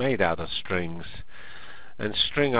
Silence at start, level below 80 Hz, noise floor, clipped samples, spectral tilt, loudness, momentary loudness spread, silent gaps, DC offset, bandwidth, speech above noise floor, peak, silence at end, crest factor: 0 s; -48 dBFS; -47 dBFS; under 0.1%; -9 dB/octave; -27 LUFS; 21 LU; none; 2%; 4 kHz; 20 dB; -6 dBFS; 0 s; 20 dB